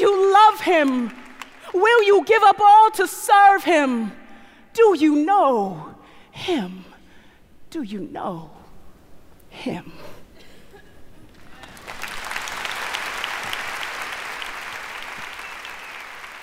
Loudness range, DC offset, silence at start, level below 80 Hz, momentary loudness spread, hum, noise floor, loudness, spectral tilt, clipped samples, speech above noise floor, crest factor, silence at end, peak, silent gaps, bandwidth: 20 LU; under 0.1%; 0 s; -54 dBFS; 21 LU; none; -48 dBFS; -18 LUFS; -3.5 dB/octave; under 0.1%; 31 dB; 18 dB; 0 s; -4 dBFS; none; 16 kHz